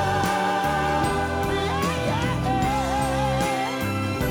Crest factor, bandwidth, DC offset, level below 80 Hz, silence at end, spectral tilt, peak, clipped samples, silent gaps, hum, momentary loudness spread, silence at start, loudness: 10 dB; over 20 kHz; under 0.1%; -38 dBFS; 0 s; -5 dB/octave; -12 dBFS; under 0.1%; none; none; 3 LU; 0 s; -24 LUFS